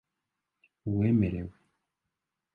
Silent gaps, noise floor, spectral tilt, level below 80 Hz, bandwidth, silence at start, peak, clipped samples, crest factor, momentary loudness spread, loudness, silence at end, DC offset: none; -86 dBFS; -11.5 dB/octave; -52 dBFS; 4 kHz; 0.85 s; -14 dBFS; under 0.1%; 18 dB; 16 LU; -29 LUFS; 1.05 s; under 0.1%